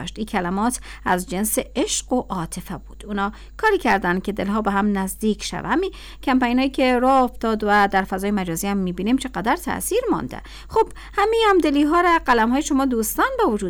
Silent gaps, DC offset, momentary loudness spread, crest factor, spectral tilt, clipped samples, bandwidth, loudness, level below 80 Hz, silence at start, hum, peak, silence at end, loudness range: none; under 0.1%; 9 LU; 12 dB; -4.5 dB/octave; under 0.1%; 19.5 kHz; -21 LUFS; -40 dBFS; 0 s; none; -8 dBFS; 0 s; 4 LU